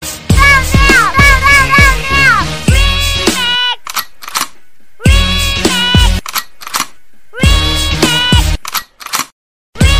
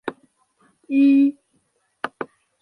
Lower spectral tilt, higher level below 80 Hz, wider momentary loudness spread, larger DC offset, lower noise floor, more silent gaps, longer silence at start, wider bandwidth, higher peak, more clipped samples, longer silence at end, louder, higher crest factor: second, -3.5 dB/octave vs -6.5 dB/octave; first, -16 dBFS vs -76 dBFS; second, 13 LU vs 20 LU; first, 4% vs under 0.1%; second, -49 dBFS vs -67 dBFS; first, 9.32-9.73 s vs none; about the same, 0 s vs 0.05 s; first, 16 kHz vs 4.7 kHz; first, 0 dBFS vs -4 dBFS; first, 2% vs under 0.1%; second, 0 s vs 0.35 s; first, -10 LUFS vs -19 LUFS; second, 10 dB vs 18 dB